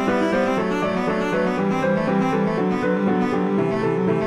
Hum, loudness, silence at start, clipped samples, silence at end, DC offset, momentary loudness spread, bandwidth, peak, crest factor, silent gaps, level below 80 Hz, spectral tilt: none; -21 LUFS; 0 s; under 0.1%; 0 s; under 0.1%; 2 LU; 11.5 kHz; -8 dBFS; 12 dB; none; -50 dBFS; -7.5 dB/octave